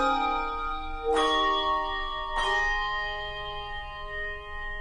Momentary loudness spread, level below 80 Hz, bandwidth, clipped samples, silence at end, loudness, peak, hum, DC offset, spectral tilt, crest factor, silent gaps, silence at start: 12 LU; -40 dBFS; 10.5 kHz; under 0.1%; 0 s; -28 LUFS; -14 dBFS; none; under 0.1%; -3 dB/octave; 16 dB; none; 0 s